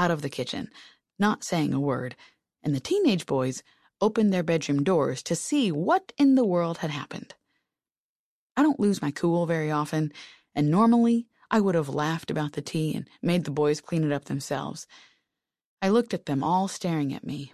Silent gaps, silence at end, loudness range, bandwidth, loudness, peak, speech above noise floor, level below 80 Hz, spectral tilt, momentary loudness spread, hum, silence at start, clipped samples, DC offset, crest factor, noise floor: 7.97-8.55 s, 15.65-15.77 s; 0.05 s; 4 LU; 13.5 kHz; -26 LUFS; -8 dBFS; over 65 dB; -66 dBFS; -6 dB/octave; 11 LU; none; 0 s; under 0.1%; under 0.1%; 18 dB; under -90 dBFS